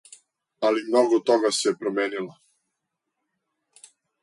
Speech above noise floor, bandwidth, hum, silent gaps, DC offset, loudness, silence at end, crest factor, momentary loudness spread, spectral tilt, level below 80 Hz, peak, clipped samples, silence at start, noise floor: 59 dB; 11.5 kHz; none; none; under 0.1%; -23 LUFS; 1.9 s; 18 dB; 9 LU; -3 dB/octave; -78 dBFS; -8 dBFS; under 0.1%; 0.6 s; -81 dBFS